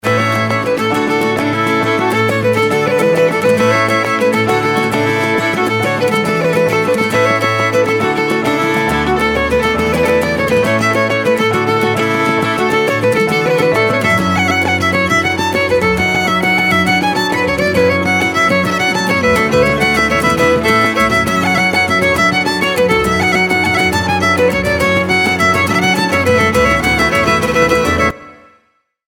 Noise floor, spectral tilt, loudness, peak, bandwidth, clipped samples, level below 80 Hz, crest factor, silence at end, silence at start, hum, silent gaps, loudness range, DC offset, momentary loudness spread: -58 dBFS; -4.5 dB/octave; -12 LUFS; 0 dBFS; 19 kHz; under 0.1%; -36 dBFS; 12 dB; 0.75 s; 0.05 s; none; none; 2 LU; under 0.1%; 3 LU